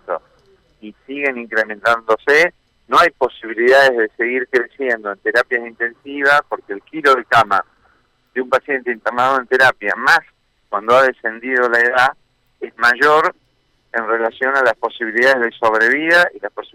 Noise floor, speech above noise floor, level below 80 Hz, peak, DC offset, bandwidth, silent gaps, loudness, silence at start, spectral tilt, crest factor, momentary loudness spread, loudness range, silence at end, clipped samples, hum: -61 dBFS; 45 dB; -58 dBFS; -4 dBFS; under 0.1%; 16.5 kHz; none; -15 LUFS; 0.1 s; -3.5 dB/octave; 12 dB; 11 LU; 2 LU; 0.1 s; under 0.1%; none